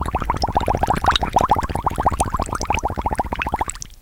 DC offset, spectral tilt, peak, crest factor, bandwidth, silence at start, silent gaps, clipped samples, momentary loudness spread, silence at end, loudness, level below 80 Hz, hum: under 0.1%; -4.5 dB/octave; 0 dBFS; 20 dB; 18.5 kHz; 0 s; none; under 0.1%; 6 LU; 0.05 s; -21 LUFS; -30 dBFS; none